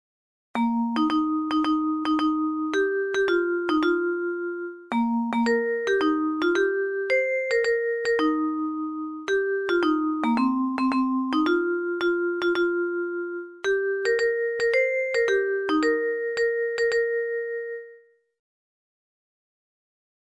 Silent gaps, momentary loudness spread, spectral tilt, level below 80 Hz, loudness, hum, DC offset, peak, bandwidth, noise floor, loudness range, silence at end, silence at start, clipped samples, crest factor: none; 6 LU; -4.5 dB/octave; -62 dBFS; -24 LUFS; none; under 0.1%; -10 dBFS; 11 kHz; -53 dBFS; 3 LU; 2.25 s; 0.55 s; under 0.1%; 14 dB